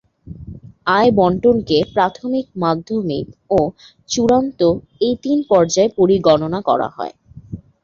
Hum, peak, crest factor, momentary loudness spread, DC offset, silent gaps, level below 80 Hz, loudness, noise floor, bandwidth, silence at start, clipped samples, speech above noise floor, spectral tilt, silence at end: none; 0 dBFS; 16 dB; 16 LU; under 0.1%; none; -46 dBFS; -17 LUFS; -36 dBFS; 7.4 kHz; 0.25 s; under 0.1%; 20 dB; -5.5 dB/octave; 0.25 s